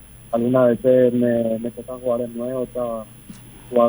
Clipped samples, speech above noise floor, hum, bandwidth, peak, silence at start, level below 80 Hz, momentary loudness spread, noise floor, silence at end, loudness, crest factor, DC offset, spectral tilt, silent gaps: under 0.1%; 21 dB; none; over 20 kHz; -4 dBFS; 0.15 s; -50 dBFS; 20 LU; -41 dBFS; 0 s; -20 LUFS; 16 dB; under 0.1%; -7.5 dB/octave; none